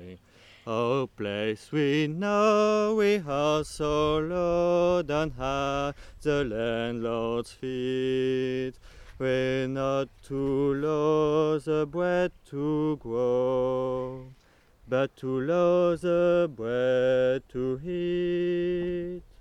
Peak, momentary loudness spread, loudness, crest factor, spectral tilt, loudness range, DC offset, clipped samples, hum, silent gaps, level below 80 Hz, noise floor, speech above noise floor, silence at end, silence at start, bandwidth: -12 dBFS; 8 LU; -27 LUFS; 16 dB; -6.5 dB/octave; 4 LU; under 0.1%; under 0.1%; none; none; -50 dBFS; -58 dBFS; 32 dB; 0.2 s; 0 s; 12 kHz